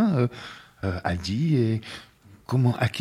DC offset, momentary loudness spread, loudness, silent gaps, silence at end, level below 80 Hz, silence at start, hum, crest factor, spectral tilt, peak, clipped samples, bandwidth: under 0.1%; 17 LU; -26 LUFS; none; 0 s; -50 dBFS; 0 s; none; 18 dB; -7 dB/octave; -8 dBFS; under 0.1%; 12 kHz